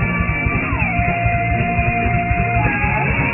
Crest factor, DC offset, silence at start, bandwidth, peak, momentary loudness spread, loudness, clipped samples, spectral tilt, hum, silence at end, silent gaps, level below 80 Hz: 14 dB; under 0.1%; 0 s; 3 kHz; -4 dBFS; 1 LU; -17 LUFS; under 0.1%; -11 dB/octave; none; 0 s; none; -26 dBFS